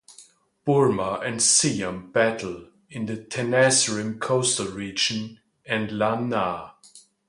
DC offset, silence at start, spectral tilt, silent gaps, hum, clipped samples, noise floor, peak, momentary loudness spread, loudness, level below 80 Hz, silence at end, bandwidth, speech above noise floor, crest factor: under 0.1%; 0.1 s; -3 dB/octave; none; none; under 0.1%; -53 dBFS; -6 dBFS; 15 LU; -23 LUFS; -60 dBFS; 0.3 s; 11.5 kHz; 30 dB; 20 dB